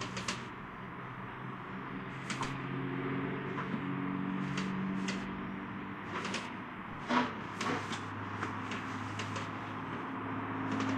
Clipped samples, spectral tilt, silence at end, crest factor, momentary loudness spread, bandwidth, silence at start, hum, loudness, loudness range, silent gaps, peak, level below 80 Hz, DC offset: under 0.1%; -5 dB/octave; 0 s; 22 dB; 8 LU; 11 kHz; 0 s; none; -38 LUFS; 2 LU; none; -16 dBFS; -62 dBFS; under 0.1%